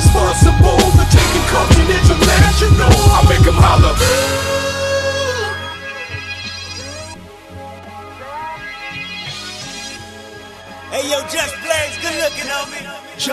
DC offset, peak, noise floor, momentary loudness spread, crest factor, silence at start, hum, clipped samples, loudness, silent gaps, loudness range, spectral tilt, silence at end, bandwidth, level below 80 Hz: under 0.1%; 0 dBFS; -34 dBFS; 22 LU; 14 dB; 0 s; none; under 0.1%; -14 LUFS; none; 17 LU; -4.5 dB/octave; 0 s; 14 kHz; -20 dBFS